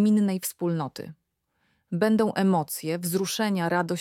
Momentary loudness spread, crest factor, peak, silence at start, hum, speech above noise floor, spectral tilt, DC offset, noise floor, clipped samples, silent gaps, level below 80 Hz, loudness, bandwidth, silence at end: 12 LU; 16 dB; -10 dBFS; 0 s; none; 48 dB; -5.5 dB/octave; under 0.1%; -73 dBFS; under 0.1%; none; -70 dBFS; -26 LUFS; 17 kHz; 0 s